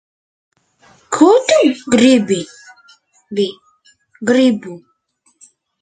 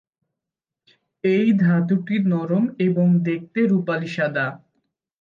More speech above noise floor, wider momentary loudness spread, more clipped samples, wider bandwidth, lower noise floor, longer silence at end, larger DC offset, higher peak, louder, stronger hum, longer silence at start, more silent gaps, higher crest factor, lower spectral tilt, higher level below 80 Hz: second, 47 dB vs 67 dB; first, 14 LU vs 7 LU; neither; first, 9.4 kHz vs 6.8 kHz; second, -61 dBFS vs -86 dBFS; first, 1.05 s vs 0.65 s; neither; first, 0 dBFS vs -8 dBFS; first, -14 LUFS vs -21 LUFS; neither; second, 1.1 s vs 1.25 s; neither; about the same, 16 dB vs 12 dB; second, -4.5 dB/octave vs -9 dB/octave; first, -60 dBFS vs -70 dBFS